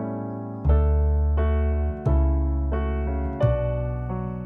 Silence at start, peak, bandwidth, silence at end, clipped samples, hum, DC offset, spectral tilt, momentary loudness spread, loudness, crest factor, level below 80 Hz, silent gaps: 0 s; -8 dBFS; 3.2 kHz; 0 s; under 0.1%; none; under 0.1%; -11 dB/octave; 7 LU; -24 LUFS; 14 dB; -24 dBFS; none